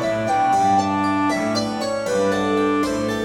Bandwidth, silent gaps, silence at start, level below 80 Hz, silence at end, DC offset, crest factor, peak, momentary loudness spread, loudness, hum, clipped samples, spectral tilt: 16 kHz; none; 0 s; -50 dBFS; 0 s; under 0.1%; 12 dB; -6 dBFS; 5 LU; -20 LUFS; none; under 0.1%; -5 dB/octave